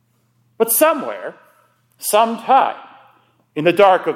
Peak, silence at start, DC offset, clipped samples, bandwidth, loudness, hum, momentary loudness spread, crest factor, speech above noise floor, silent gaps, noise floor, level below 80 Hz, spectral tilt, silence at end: 0 dBFS; 0.6 s; under 0.1%; under 0.1%; 16.5 kHz; -16 LUFS; none; 18 LU; 18 dB; 46 dB; none; -61 dBFS; -68 dBFS; -3 dB/octave; 0 s